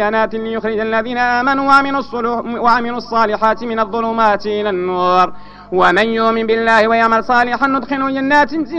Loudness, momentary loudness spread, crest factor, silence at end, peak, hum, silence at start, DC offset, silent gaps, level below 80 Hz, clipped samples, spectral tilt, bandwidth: -14 LUFS; 7 LU; 14 dB; 0 s; 0 dBFS; 50 Hz at -40 dBFS; 0 s; under 0.1%; none; -46 dBFS; under 0.1%; -5.5 dB/octave; 9.8 kHz